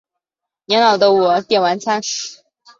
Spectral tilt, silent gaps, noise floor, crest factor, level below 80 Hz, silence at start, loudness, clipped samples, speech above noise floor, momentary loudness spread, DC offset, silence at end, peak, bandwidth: -3 dB/octave; none; -85 dBFS; 16 dB; -68 dBFS; 0.7 s; -15 LUFS; under 0.1%; 70 dB; 11 LU; under 0.1%; 0.45 s; -2 dBFS; 7.6 kHz